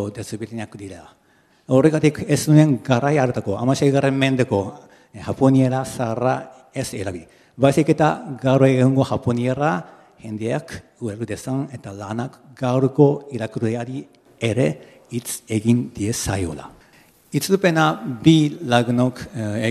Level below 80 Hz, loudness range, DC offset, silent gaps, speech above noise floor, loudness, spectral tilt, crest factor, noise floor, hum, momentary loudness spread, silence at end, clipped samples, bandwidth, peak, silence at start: -54 dBFS; 6 LU; under 0.1%; none; 33 dB; -20 LUFS; -6.5 dB/octave; 20 dB; -53 dBFS; none; 16 LU; 0 s; under 0.1%; 14.5 kHz; 0 dBFS; 0 s